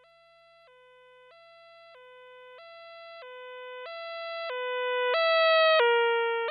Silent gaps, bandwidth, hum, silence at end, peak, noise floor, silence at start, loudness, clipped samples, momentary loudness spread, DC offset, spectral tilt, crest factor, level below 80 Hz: none; 5 kHz; 50 Hz at -85 dBFS; 0 s; -14 dBFS; -59 dBFS; 2.15 s; -25 LUFS; under 0.1%; 25 LU; under 0.1%; -1 dB/octave; 16 dB; -86 dBFS